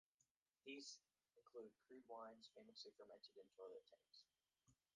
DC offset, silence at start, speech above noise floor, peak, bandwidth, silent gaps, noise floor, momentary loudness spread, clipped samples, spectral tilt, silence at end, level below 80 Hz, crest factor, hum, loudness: under 0.1%; 0.2 s; 27 dB; -44 dBFS; 9 kHz; 0.31-0.42 s; -90 dBFS; 8 LU; under 0.1%; -2 dB/octave; 0.2 s; under -90 dBFS; 20 dB; none; -62 LUFS